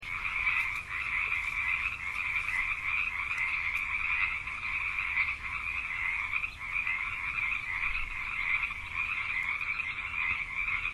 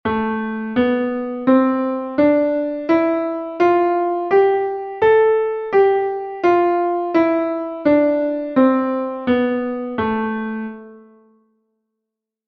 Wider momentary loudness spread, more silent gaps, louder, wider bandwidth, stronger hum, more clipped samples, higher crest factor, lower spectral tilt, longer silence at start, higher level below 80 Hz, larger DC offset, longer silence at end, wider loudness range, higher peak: second, 4 LU vs 8 LU; neither; second, -30 LUFS vs -18 LUFS; first, 13.5 kHz vs 6.2 kHz; neither; neither; about the same, 16 dB vs 14 dB; second, -2 dB/octave vs -8 dB/octave; about the same, 0 s vs 0.05 s; about the same, -50 dBFS vs -54 dBFS; neither; second, 0 s vs 1.5 s; second, 1 LU vs 4 LU; second, -16 dBFS vs -2 dBFS